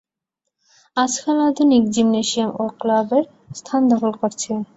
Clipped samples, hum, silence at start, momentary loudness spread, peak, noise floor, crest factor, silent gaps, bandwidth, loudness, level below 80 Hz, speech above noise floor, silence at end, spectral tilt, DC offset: under 0.1%; none; 0.95 s; 9 LU; -4 dBFS; -80 dBFS; 16 dB; none; 8.2 kHz; -19 LUFS; -60 dBFS; 62 dB; 0.15 s; -4 dB/octave; under 0.1%